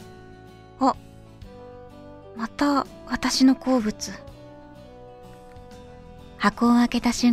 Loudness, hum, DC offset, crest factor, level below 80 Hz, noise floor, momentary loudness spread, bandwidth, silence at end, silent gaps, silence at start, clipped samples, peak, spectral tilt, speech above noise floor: -23 LUFS; none; under 0.1%; 18 dB; -48 dBFS; -46 dBFS; 26 LU; 14 kHz; 0 s; none; 0 s; under 0.1%; -6 dBFS; -4 dB/octave; 24 dB